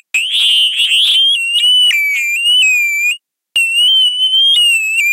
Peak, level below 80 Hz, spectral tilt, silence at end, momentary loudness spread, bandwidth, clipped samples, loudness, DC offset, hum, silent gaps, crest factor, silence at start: -4 dBFS; -78 dBFS; 7.5 dB/octave; 0 s; 6 LU; 16 kHz; under 0.1%; -9 LUFS; under 0.1%; none; none; 8 dB; 0.15 s